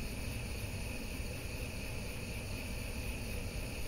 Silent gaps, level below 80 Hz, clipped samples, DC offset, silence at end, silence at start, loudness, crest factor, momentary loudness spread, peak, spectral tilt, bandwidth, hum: none; -44 dBFS; under 0.1%; under 0.1%; 0 s; 0 s; -42 LUFS; 14 dB; 1 LU; -28 dBFS; -4.5 dB/octave; 16 kHz; none